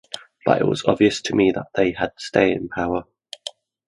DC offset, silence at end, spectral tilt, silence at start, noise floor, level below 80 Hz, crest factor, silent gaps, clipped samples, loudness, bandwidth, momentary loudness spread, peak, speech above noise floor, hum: under 0.1%; 0.35 s; -5.5 dB/octave; 0.15 s; -39 dBFS; -50 dBFS; 20 dB; none; under 0.1%; -21 LUFS; 11.5 kHz; 16 LU; 0 dBFS; 19 dB; none